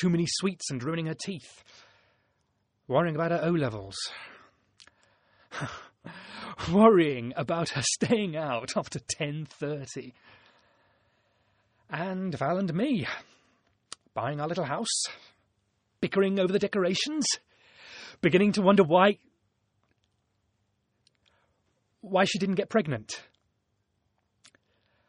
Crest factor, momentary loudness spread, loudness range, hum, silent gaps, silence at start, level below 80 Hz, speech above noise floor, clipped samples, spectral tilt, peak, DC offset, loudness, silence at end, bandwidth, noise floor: 24 dB; 20 LU; 9 LU; none; none; 0 s; -64 dBFS; 49 dB; under 0.1%; -4.5 dB/octave; -6 dBFS; under 0.1%; -28 LUFS; 1.85 s; 10 kHz; -76 dBFS